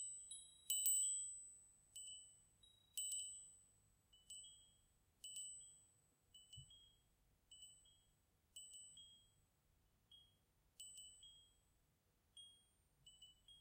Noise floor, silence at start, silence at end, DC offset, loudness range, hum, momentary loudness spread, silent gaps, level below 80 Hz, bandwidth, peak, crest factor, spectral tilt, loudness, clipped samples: -82 dBFS; 0 s; 0 s; under 0.1%; 19 LU; none; 27 LU; none; -84 dBFS; 16 kHz; -22 dBFS; 32 dB; 2 dB/octave; -46 LUFS; under 0.1%